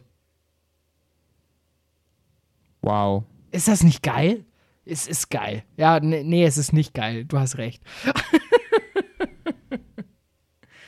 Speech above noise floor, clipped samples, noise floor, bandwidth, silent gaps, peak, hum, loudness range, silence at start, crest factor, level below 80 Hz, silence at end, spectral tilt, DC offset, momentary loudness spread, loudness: 49 dB; under 0.1%; -70 dBFS; 14 kHz; none; -4 dBFS; none; 6 LU; 2.85 s; 20 dB; -50 dBFS; 0.85 s; -5.5 dB/octave; under 0.1%; 14 LU; -22 LUFS